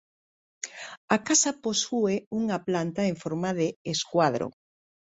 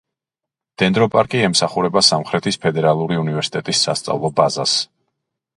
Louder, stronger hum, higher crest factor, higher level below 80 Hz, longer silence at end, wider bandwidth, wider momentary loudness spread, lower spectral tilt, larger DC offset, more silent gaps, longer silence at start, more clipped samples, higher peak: second, -27 LUFS vs -17 LUFS; neither; about the same, 22 dB vs 18 dB; second, -68 dBFS vs -56 dBFS; about the same, 0.65 s vs 0.7 s; second, 8.2 kHz vs 11.5 kHz; first, 15 LU vs 7 LU; about the same, -3.5 dB/octave vs -4 dB/octave; neither; first, 0.97-1.08 s, 2.27-2.31 s, 3.76-3.85 s vs none; second, 0.65 s vs 0.8 s; neither; second, -6 dBFS vs 0 dBFS